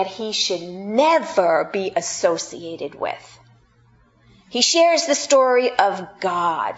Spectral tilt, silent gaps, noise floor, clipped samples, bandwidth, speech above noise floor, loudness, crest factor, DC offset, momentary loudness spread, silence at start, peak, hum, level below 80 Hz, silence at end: -2 dB/octave; none; -56 dBFS; under 0.1%; 8.2 kHz; 36 dB; -19 LUFS; 20 dB; under 0.1%; 13 LU; 0 s; 0 dBFS; none; -64 dBFS; 0 s